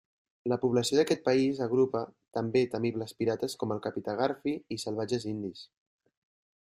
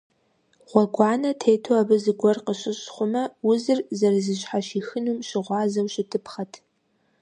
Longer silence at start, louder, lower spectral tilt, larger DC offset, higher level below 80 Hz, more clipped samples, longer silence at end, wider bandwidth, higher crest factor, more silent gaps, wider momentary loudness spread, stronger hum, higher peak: second, 0.45 s vs 0.7 s; second, -30 LUFS vs -23 LUFS; about the same, -5.5 dB/octave vs -5.5 dB/octave; neither; about the same, -70 dBFS vs -74 dBFS; neither; first, 1.05 s vs 0.65 s; first, 15.5 kHz vs 10 kHz; about the same, 18 dB vs 22 dB; neither; about the same, 10 LU vs 9 LU; neither; second, -12 dBFS vs -2 dBFS